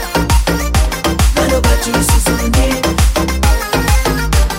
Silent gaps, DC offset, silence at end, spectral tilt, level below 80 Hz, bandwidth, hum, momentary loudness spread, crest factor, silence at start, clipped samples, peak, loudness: none; under 0.1%; 0 s; -4.5 dB/octave; -14 dBFS; 16.5 kHz; none; 2 LU; 12 dB; 0 s; under 0.1%; 0 dBFS; -13 LUFS